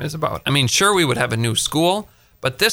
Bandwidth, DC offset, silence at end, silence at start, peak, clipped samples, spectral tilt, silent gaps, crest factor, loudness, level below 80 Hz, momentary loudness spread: over 20 kHz; under 0.1%; 0 s; 0 s; -4 dBFS; under 0.1%; -3.5 dB/octave; none; 16 dB; -18 LUFS; -48 dBFS; 10 LU